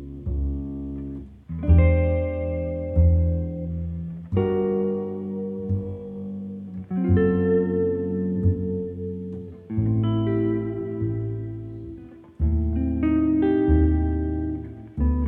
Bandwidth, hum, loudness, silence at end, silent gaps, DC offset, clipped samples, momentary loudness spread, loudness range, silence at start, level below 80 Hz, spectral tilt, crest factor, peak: 3.3 kHz; none; -24 LUFS; 0 s; none; under 0.1%; under 0.1%; 14 LU; 4 LU; 0 s; -30 dBFS; -12 dB/octave; 16 dB; -6 dBFS